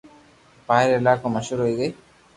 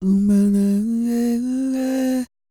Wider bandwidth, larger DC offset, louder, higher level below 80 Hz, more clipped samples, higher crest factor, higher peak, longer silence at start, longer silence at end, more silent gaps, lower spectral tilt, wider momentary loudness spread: second, 11.5 kHz vs 15 kHz; neither; about the same, -21 LUFS vs -19 LUFS; second, -58 dBFS vs -50 dBFS; neither; first, 20 dB vs 10 dB; first, -4 dBFS vs -10 dBFS; first, 0.7 s vs 0 s; first, 0.45 s vs 0.25 s; neither; second, -6 dB/octave vs -7.5 dB/octave; about the same, 8 LU vs 6 LU